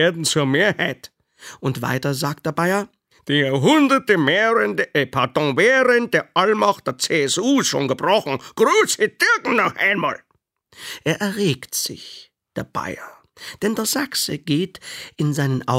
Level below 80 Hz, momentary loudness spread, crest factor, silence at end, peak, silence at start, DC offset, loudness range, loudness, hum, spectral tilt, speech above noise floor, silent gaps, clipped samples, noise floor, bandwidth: -62 dBFS; 16 LU; 18 dB; 0 s; -2 dBFS; 0 s; under 0.1%; 8 LU; -19 LUFS; none; -4 dB/octave; 42 dB; none; under 0.1%; -61 dBFS; 16 kHz